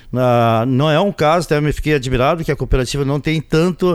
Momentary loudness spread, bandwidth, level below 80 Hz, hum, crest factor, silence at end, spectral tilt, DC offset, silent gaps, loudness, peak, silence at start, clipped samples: 4 LU; 15 kHz; -28 dBFS; none; 14 dB; 0 s; -6.5 dB/octave; under 0.1%; none; -16 LUFS; -2 dBFS; 0.05 s; under 0.1%